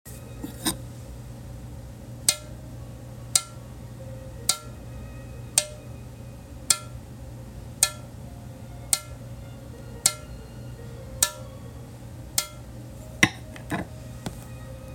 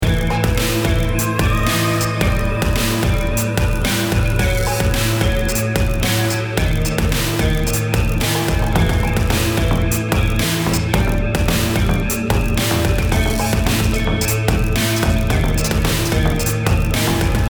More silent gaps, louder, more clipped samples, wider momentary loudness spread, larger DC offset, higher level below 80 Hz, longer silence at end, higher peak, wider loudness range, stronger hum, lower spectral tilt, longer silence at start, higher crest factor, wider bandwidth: neither; second, -26 LUFS vs -17 LUFS; neither; first, 18 LU vs 2 LU; neither; second, -46 dBFS vs -22 dBFS; about the same, 0 s vs 0.05 s; about the same, -2 dBFS vs -2 dBFS; about the same, 2 LU vs 1 LU; neither; second, -2 dB/octave vs -5 dB/octave; about the same, 0.05 s vs 0 s; first, 30 dB vs 14 dB; second, 17 kHz vs over 20 kHz